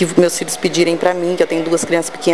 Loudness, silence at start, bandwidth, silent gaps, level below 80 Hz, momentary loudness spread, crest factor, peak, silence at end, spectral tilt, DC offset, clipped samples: -16 LUFS; 0 s; 12 kHz; none; -54 dBFS; 3 LU; 16 dB; 0 dBFS; 0 s; -4 dB/octave; 1%; under 0.1%